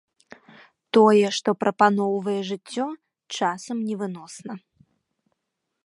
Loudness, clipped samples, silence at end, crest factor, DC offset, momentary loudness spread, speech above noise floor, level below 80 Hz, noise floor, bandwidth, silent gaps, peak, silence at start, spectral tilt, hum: -23 LUFS; under 0.1%; 1.25 s; 22 dB; under 0.1%; 20 LU; 58 dB; -76 dBFS; -80 dBFS; 11.5 kHz; none; -4 dBFS; 0.95 s; -5 dB/octave; none